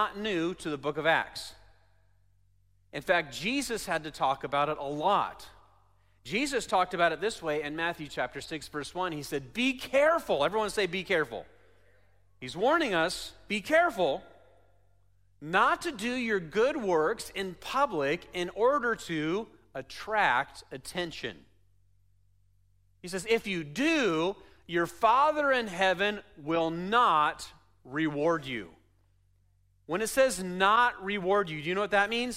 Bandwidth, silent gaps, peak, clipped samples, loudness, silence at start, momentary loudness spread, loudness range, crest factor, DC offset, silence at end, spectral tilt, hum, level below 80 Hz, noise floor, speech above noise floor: 16 kHz; none; -10 dBFS; under 0.1%; -29 LUFS; 0 s; 13 LU; 5 LU; 20 dB; under 0.1%; 0 s; -4 dB/octave; none; -62 dBFS; -67 dBFS; 38 dB